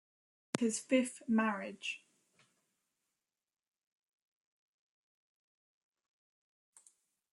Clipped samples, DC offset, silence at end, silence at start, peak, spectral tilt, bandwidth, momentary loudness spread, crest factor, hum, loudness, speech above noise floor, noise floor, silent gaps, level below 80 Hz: under 0.1%; under 0.1%; 5.35 s; 0.55 s; -12 dBFS; -4 dB/octave; 12 kHz; 10 LU; 30 dB; none; -35 LUFS; over 55 dB; under -90 dBFS; none; -88 dBFS